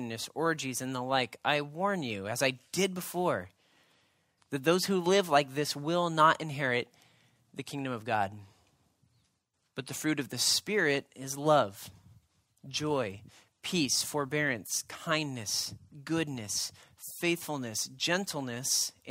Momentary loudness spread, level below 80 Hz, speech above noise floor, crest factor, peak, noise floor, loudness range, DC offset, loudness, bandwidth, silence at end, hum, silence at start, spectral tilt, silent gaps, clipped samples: 13 LU; -72 dBFS; 47 dB; 22 dB; -10 dBFS; -78 dBFS; 5 LU; under 0.1%; -31 LUFS; 16 kHz; 0 s; none; 0 s; -3 dB/octave; none; under 0.1%